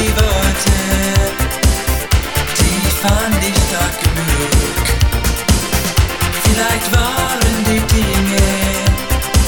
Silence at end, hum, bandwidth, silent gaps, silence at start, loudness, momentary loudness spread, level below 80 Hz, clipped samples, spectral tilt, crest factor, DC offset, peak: 0 s; none; over 20 kHz; none; 0 s; -14 LUFS; 2 LU; -18 dBFS; under 0.1%; -4 dB/octave; 14 dB; under 0.1%; 0 dBFS